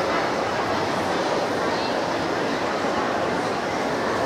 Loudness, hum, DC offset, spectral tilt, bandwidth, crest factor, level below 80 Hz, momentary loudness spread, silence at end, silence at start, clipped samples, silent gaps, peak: -24 LUFS; none; under 0.1%; -4.5 dB/octave; 16 kHz; 14 dB; -54 dBFS; 1 LU; 0 s; 0 s; under 0.1%; none; -10 dBFS